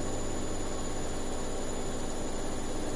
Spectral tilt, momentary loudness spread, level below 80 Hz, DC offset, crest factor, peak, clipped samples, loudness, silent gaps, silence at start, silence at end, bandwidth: -4 dB/octave; 1 LU; -36 dBFS; under 0.1%; 12 dB; -20 dBFS; under 0.1%; -36 LUFS; none; 0 s; 0 s; 11.5 kHz